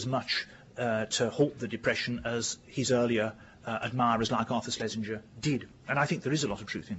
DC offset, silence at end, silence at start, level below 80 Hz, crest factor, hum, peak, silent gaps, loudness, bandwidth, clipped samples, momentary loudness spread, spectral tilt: under 0.1%; 0 s; 0 s; -60 dBFS; 18 dB; none; -14 dBFS; none; -31 LUFS; 8 kHz; under 0.1%; 8 LU; -4 dB/octave